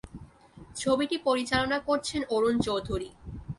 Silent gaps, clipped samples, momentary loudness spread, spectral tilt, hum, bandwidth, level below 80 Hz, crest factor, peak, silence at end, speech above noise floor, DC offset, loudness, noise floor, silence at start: none; under 0.1%; 17 LU; -4.5 dB/octave; none; 11.5 kHz; -48 dBFS; 18 dB; -12 dBFS; 0.05 s; 24 dB; under 0.1%; -28 LUFS; -51 dBFS; 0.05 s